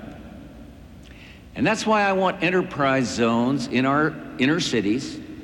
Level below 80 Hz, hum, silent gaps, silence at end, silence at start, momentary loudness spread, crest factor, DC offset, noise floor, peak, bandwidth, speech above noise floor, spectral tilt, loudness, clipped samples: -50 dBFS; none; none; 0 s; 0 s; 18 LU; 16 dB; under 0.1%; -44 dBFS; -8 dBFS; 17 kHz; 22 dB; -5 dB/octave; -22 LUFS; under 0.1%